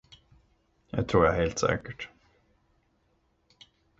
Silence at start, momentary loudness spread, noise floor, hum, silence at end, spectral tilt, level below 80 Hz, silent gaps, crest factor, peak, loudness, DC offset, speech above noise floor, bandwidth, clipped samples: 0.95 s; 18 LU; -71 dBFS; none; 1.95 s; -5.5 dB/octave; -48 dBFS; none; 24 dB; -8 dBFS; -27 LUFS; under 0.1%; 44 dB; 7.8 kHz; under 0.1%